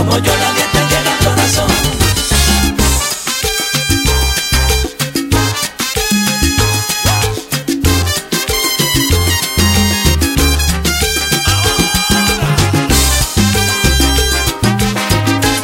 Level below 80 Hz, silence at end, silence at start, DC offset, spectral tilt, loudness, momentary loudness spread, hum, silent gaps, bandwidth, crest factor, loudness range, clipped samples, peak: -20 dBFS; 0 s; 0 s; under 0.1%; -3.5 dB/octave; -12 LUFS; 4 LU; none; none; 17 kHz; 12 dB; 2 LU; under 0.1%; 0 dBFS